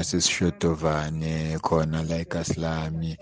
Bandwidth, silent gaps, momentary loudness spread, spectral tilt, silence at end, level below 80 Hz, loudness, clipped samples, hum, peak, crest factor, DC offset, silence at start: 10 kHz; none; 6 LU; -4.5 dB/octave; 0.05 s; -46 dBFS; -26 LUFS; under 0.1%; none; -8 dBFS; 18 dB; under 0.1%; 0 s